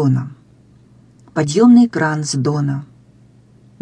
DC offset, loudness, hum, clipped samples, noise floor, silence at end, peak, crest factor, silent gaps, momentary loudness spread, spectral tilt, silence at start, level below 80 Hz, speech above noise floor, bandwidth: under 0.1%; -15 LUFS; none; under 0.1%; -48 dBFS; 0.95 s; -2 dBFS; 16 dB; none; 16 LU; -6.5 dB/octave; 0 s; -58 dBFS; 34 dB; 10 kHz